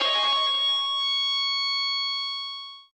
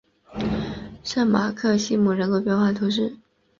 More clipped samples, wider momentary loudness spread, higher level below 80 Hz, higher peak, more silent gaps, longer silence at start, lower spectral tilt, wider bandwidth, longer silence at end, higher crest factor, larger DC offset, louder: neither; about the same, 9 LU vs 9 LU; second, under -90 dBFS vs -48 dBFS; second, -12 dBFS vs -6 dBFS; neither; second, 0 s vs 0.3 s; second, 3 dB/octave vs -6 dB/octave; first, 9.8 kHz vs 7.4 kHz; second, 0.15 s vs 0.45 s; about the same, 14 dB vs 16 dB; neither; about the same, -23 LUFS vs -23 LUFS